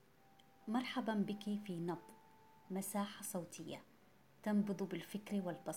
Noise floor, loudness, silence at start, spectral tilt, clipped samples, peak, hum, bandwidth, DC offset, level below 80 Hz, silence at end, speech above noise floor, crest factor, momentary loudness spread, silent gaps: -69 dBFS; -43 LUFS; 0.6 s; -5.5 dB/octave; under 0.1%; -26 dBFS; none; 16.5 kHz; under 0.1%; -84 dBFS; 0 s; 27 dB; 16 dB; 11 LU; none